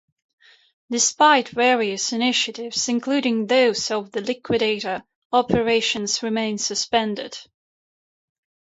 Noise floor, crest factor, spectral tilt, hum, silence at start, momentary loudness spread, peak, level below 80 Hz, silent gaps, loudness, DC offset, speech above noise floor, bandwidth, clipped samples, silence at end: under -90 dBFS; 20 dB; -2.5 dB/octave; none; 0.9 s; 11 LU; -2 dBFS; -58 dBFS; 5.15-5.30 s; -21 LUFS; under 0.1%; over 69 dB; 8.2 kHz; under 0.1%; 1.25 s